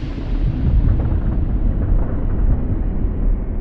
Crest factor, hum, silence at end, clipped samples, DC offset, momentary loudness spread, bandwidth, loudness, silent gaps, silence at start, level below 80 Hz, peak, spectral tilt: 12 dB; none; 0 s; under 0.1%; under 0.1%; 5 LU; 4 kHz; -21 LUFS; none; 0 s; -18 dBFS; -6 dBFS; -11 dB/octave